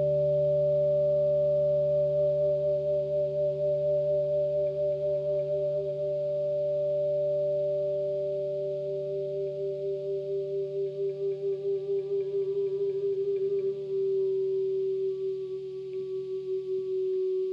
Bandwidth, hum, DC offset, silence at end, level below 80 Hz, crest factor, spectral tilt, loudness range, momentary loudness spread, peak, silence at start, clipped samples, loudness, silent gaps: 5.4 kHz; 60 Hz at -65 dBFS; under 0.1%; 0 s; -62 dBFS; 10 dB; -10 dB/octave; 5 LU; 7 LU; -18 dBFS; 0 s; under 0.1%; -29 LUFS; none